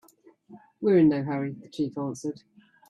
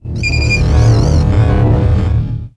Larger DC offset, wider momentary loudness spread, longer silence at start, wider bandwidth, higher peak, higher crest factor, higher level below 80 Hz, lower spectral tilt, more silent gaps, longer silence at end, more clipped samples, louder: neither; first, 15 LU vs 5 LU; first, 0.5 s vs 0.05 s; about the same, 11 kHz vs 10 kHz; second, -10 dBFS vs 0 dBFS; first, 18 dB vs 10 dB; second, -66 dBFS vs -16 dBFS; about the same, -7.5 dB/octave vs -6.5 dB/octave; neither; first, 0.55 s vs 0.1 s; neither; second, -26 LUFS vs -12 LUFS